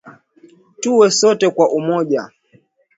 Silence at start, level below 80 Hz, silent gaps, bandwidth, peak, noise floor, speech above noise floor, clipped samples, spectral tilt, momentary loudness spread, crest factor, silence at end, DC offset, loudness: 0.05 s; -68 dBFS; none; 8 kHz; 0 dBFS; -55 dBFS; 41 dB; under 0.1%; -4 dB/octave; 11 LU; 16 dB; 0.7 s; under 0.1%; -15 LUFS